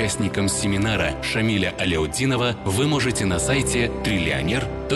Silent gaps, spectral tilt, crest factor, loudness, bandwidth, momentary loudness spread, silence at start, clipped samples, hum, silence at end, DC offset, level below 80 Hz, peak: none; -4.5 dB/octave; 12 dB; -22 LUFS; 12.5 kHz; 2 LU; 0 s; under 0.1%; none; 0 s; under 0.1%; -36 dBFS; -10 dBFS